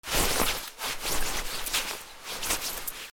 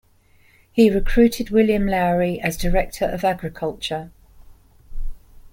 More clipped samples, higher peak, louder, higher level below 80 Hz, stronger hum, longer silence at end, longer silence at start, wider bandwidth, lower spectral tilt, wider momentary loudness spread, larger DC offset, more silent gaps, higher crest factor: neither; second, -10 dBFS vs -4 dBFS; second, -29 LUFS vs -20 LUFS; second, -40 dBFS vs -30 dBFS; neither; about the same, 0 s vs 0.05 s; second, 0.05 s vs 0.75 s; first, over 20 kHz vs 17 kHz; second, -1 dB/octave vs -6 dB/octave; second, 9 LU vs 15 LU; neither; neither; about the same, 20 dB vs 18 dB